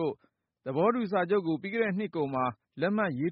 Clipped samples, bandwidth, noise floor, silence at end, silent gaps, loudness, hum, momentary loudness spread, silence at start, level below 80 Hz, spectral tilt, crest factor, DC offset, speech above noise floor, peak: under 0.1%; 5.4 kHz; -71 dBFS; 0 s; none; -30 LUFS; none; 8 LU; 0 s; -72 dBFS; -5.5 dB/octave; 16 dB; under 0.1%; 42 dB; -14 dBFS